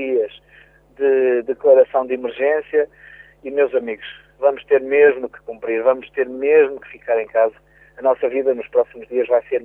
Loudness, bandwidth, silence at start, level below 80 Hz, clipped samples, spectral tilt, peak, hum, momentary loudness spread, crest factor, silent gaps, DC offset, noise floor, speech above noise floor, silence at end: -18 LUFS; 3.7 kHz; 0 s; -60 dBFS; under 0.1%; -7.5 dB/octave; -2 dBFS; none; 13 LU; 16 dB; none; under 0.1%; -50 dBFS; 32 dB; 0 s